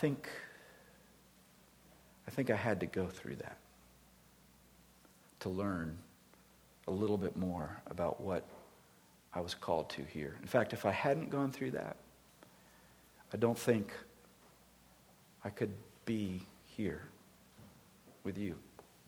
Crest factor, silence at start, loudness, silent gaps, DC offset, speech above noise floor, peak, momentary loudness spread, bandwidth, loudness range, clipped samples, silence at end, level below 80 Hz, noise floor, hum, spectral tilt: 24 dB; 0 s; -39 LUFS; none; under 0.1%; 28 dB; -18 dBFS; 22 LU; over 20 kHz; 7 LU; under 0.1%; 0.25 s; -68 dBFS; -65 dBFS; none; -6.5 dB/octave